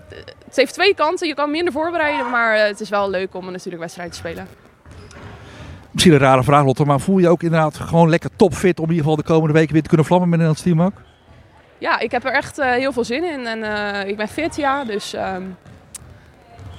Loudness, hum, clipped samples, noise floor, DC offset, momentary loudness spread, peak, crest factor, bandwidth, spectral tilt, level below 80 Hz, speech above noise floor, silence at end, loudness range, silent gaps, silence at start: -17 LUFS; none; under 0.1%; -47 dBFS; under 0.1%; 17 LU; 0 dBFS; 18 dB; 14.5 kHz; -6 dB/octave; -46 dBFS; 30 dB; 0 s; 8 LU; none; 0.1 s